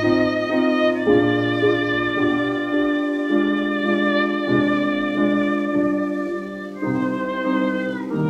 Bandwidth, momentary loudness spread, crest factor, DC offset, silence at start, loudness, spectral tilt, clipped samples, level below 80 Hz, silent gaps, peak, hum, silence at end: 8 kHz; 6 LU; 16 dB; under 0.1%; 0 s; -20 LUFS; -7 dB/octave; under 0.1%; -54 dBFS; none; -4 dBFS; none; 0 s